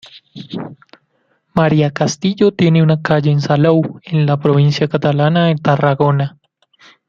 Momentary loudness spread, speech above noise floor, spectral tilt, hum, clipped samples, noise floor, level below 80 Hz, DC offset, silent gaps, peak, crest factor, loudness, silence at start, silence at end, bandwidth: 13 LU; 49 dB; -7 dB/octave; none; under 0.1%; -62 dBFS; -52 dBFS; under 0.1%; none; -2 dBFS; 14 dB; -14 LUFS; 0.15 s; 0.8 s; 7.4 kHz